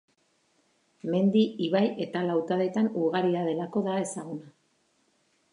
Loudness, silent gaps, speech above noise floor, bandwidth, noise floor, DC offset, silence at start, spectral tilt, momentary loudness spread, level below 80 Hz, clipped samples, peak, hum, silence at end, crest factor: -27 LUFS; none; 43 dB; 11 kHz; -70 dBFS; under 0.1%; 1.05 s; -6.5 dB/octave; 11 LU; -80 dBFS; under 0.1%; -12 dBFS; none; 1.05 s; 16 dB